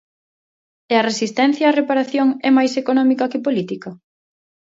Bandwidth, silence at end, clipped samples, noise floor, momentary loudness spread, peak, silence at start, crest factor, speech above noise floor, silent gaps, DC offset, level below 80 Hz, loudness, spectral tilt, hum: 7.8 kHz; 0.8 s; under 0.1%; under -90 dBFS; 7 LU; -2 dBFS; 0.9 s; 16 dB; over 73 dB; none; under 0.1%; -72 dBFS; -17 LUFS; -4.5 dB/octave; none